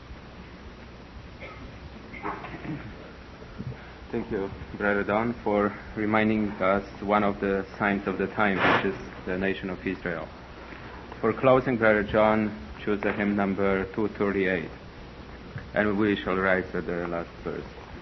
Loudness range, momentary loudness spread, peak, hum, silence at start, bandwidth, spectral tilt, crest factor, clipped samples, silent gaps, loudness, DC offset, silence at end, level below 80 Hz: 12 LU; 21 LU; -8 dBFS; none; 0 s; 6.2 kHz; -8 dB/octave; 20 dB; under 0.1%; none; -27 LUFS; under 0.1%; 0 s; -48 dBFS